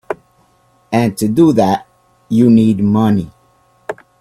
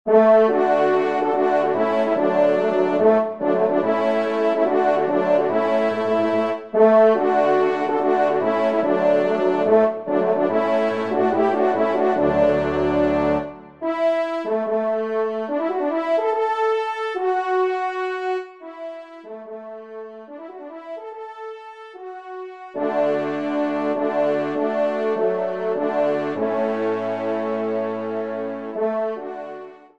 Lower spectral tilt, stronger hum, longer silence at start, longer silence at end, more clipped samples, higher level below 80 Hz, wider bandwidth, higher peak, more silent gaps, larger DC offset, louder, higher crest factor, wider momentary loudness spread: about the same, -7.5 dB/octave vs -7 dB/octave; neither; about the same, 0.1 s vs 0.05 s; about the same, 0.3 s vs 0.2 s; neither; first, -48 dBFS vs -54 dBFS; first, 15 kHz vs 8.4 kHz; first, 0 dBFS vs -4 dBFS; neither; second, under 0.1% vs 0.2%; first, -13 LUFS vs -20 LUFS; about the same, 14 dB vs 16 dB; about the same, 19 LU vs 17 LU